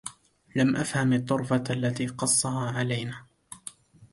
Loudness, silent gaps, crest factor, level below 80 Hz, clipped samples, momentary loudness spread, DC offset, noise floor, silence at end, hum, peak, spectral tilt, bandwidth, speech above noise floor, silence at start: -26 LUFS; none; 16 dB; -62 dBFS; under 0.1%; 18 LU; under 0.1%; -47 dBFS; 0.1 s; none; -12 dBFS; -4.5 dB/octave; 11.5 kHz; 21 dB; 0.05 s